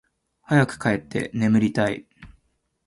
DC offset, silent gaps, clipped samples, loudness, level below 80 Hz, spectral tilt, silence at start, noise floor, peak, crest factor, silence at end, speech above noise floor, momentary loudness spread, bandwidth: under 0.1%; none; under 0.1%; -22 LUFS; -54 dBFS; -7 dB/octave; 0.5 s; -70 dBFS; -4 dBFS; 20 dB; 0.6 s; 49 dB; 7 LU; 11.5 kHz